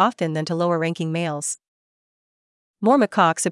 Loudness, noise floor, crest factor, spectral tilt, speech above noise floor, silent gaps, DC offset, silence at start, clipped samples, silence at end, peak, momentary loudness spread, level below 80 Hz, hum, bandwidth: -21 LUFS; under -90 dBFS; 18 dB; -5 dB/octave; over 70 dB; 1.68-2.74 s; under 0.1%; 0 s; under 0.1%; 0 s; -4 dBFS; 9 LU; -78 dBFS; none; 12 kHz